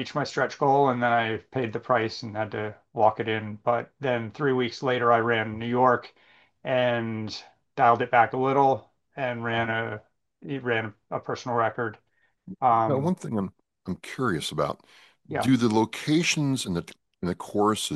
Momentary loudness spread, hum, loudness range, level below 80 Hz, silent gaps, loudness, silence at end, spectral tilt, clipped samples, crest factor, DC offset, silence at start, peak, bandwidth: 13 LU; none; 3 LU; -64 dBFS; none; -26 LUFS; 0 s; -5.5 dB/octave; under 0.1%; 20 dB; under 0.1%; 0 s; -6 dBFS; 12.5 kHz